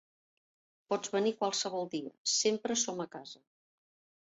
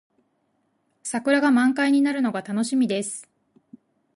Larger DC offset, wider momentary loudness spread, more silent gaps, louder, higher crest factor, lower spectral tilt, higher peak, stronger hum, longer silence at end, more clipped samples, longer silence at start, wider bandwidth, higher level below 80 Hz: neither; about the same, 12 LU vs 12 LU; first, 2.18-2.25 s vs none; second, -33 LUFS vs -22 LUFS; about the same, 18 dB vs 16 dB; second, -2 dB/octave vs -4 dB/octave; second, -18 dBFS vs -8 dBFS; neither; about the same, 0.9 s vs 0.95 s; neither; second, 0.9 s vs 1.05 s; second, 8.2 kHz vs 11.5 kHz; second, -84 dBFS vs -76 dBFS